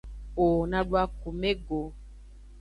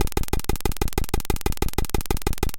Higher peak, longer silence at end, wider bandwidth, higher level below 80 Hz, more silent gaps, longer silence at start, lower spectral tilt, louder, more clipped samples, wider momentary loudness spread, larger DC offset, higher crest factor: second, -12 dBFS vs -4 dBFS; about the same, 0 s vs 0 s; second, 11 kHz vs 17.5 kHz; second, -40 dBFS vs -26 dBFS; neither; about the same, 0.05 s vs 0 s; first, -7.5 dB/octave vs -4.5 dB/octave; about the same, -29 LUFS vs -27 LUFS; neither; first, 10 LU vs 2 LU; neither; about the same, 18 dB vs 18 dB